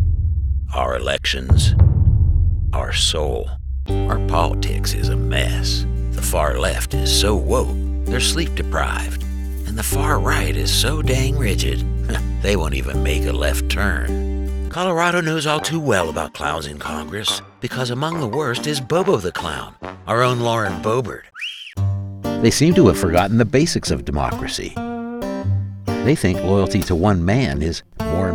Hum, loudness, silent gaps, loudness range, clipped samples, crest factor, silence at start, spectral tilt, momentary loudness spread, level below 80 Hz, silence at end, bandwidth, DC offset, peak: none; -19 LUFS; none; 4 LU; under 0.1%; 18 dB; 0 s; -5 dB/octave; 10 LU; -24 dBFS; 0 s; 17.5 kHz; under 0.1%; 0 dBFS